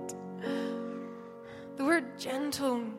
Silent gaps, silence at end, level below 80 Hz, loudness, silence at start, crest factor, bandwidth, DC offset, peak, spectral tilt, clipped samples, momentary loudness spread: none; 0 s; -72 dBFS; -33 LUFS; 0 s; 20 dB; 16 kHz; under 0.1%; -14 dBFS; -4 dB/octave; under 0.1%; 17 LU